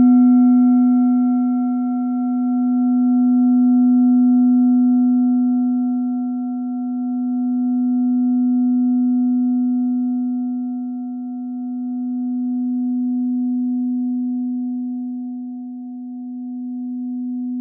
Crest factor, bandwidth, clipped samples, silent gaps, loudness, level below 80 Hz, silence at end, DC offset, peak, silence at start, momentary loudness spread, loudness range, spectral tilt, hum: 10 dB; 1.4 kHz; under 0.1%; none; -18 LUFS; under -90 dBFS; 0 s; under 0.1%; -6 dBFS; 0 s; 13 LU; 8 LU; -14 dB/octave; none